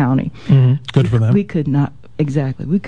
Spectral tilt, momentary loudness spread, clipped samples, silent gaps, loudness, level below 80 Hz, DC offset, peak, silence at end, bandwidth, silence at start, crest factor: -9 dB/octave; 7 LU; under 0.1%; none; -16 LUFS; -44 dBFS; 1%; 0 dBFS; 0 s; 7.2 kHz; 0 s; 14 dB